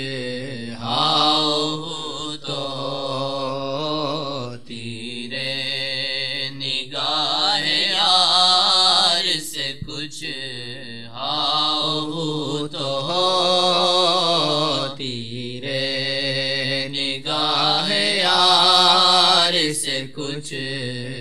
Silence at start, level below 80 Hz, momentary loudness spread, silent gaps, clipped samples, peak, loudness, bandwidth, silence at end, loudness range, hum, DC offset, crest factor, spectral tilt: 0 s; -60 dBFS; 15 LU; none; under 0.1%; -2 dBFS; -19 LUFS; 14.5 kHz; 0 s; 10 LU; none; 1%; 18 dB; -3 dB/octave